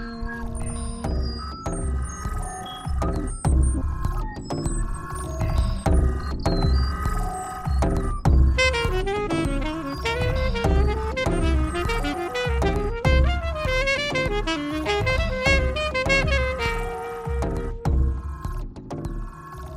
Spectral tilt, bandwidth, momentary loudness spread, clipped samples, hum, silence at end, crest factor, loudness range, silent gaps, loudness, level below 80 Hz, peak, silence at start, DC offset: -5.5 dB/octave; 13 kHz; 11 LU; under 0.1%; none; 0 s; 20 dB; 5 LU; none; -25 LUFS; -26 dBFS; -4 dBFS; 0 s; under 0.1%